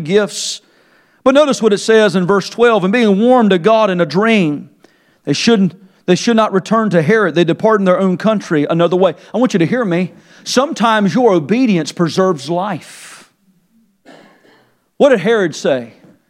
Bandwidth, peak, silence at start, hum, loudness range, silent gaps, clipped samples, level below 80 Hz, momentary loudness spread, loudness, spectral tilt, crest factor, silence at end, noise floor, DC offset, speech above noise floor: 12.5 kHz; 0 dBFS; 0 s; none; 6 LU; none; under 0.1%; -62 dBFS; 9 LU; -13 LUFS; -5.5 dB/octave; 14 dB; 0.4 s; -56 dBFS; under 0.1%; 43 dB